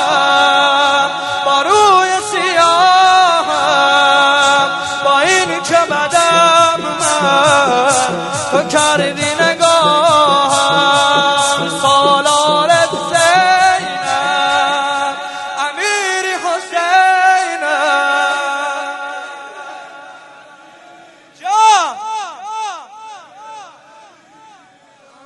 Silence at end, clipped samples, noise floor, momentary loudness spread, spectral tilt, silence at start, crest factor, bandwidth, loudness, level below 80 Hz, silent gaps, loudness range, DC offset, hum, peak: 1.6 s; under 0.1%; -46 dBFS; 13 LU; -1.5 dB/octave; 0 s; 14 dB; 11.5 kHz; -12 LUFS; -56 dBFS; none; 8 LU; under 0.1%; none; 0 dBFS